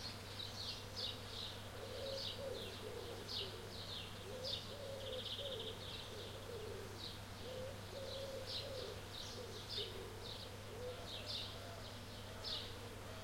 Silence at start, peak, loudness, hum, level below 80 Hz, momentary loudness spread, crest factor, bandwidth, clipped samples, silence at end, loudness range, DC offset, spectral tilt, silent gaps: 0 s; -30 dBFS; -47 LUFS; none; -62 dBFS; 5 LU; 18 dB; 16.5 kHz; under 0.1%; 0 s; 2 LU; under 0.1%; -3.5 dB/octave; none